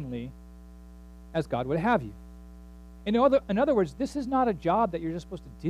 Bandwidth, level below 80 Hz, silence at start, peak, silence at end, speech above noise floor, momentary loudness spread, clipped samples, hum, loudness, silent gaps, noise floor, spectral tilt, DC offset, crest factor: 12.5 kHz; -48 dBFS; 0 s; -10 dBFS; 0 s; 20 dB; 19 LU; under 0.1%; 60 Hz at -45 dBFS; -27 LUFS; none; -47 dBFS; -7.5 dB/octave; under 0.1%; 18 dB